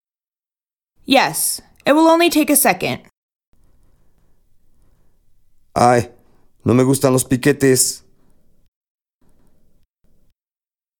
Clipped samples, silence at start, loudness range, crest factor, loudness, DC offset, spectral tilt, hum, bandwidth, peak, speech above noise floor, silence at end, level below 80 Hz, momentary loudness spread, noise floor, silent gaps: under 0.1%; 1.1 s; 7 LU; 20 dB; -15 LUFS; under 0.1%; -4 dB/octave; none; 19 kHz; 0 dBFS; over 76 dB; 3 s; -52 dBFS; 12 LU; under -90 dBFS; 3.17-3.29 s, 3.47-3.52 s